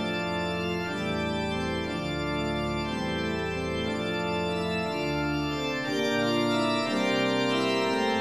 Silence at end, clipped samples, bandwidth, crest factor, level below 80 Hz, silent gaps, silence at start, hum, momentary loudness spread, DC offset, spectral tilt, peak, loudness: 0 s; under 0.1%; 15 kHz; 14 dB; -48 dBFS; none; 0 s; none; 5 LU; 0.1%; -5 dB/octave; -14 dBFS; -28 LUFS